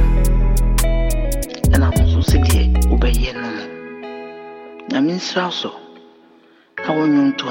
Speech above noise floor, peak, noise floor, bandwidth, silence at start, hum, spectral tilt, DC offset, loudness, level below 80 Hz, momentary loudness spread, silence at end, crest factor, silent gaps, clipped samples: 32 dB; -2 dBFS; -50 dBFS; 17 kHz; 0 s; none; -5.5 dB/octave; under 0.1%; -18 LUFS; -18 dBFS; 17 LU; 0 s; 14 dB; none; under 0.1%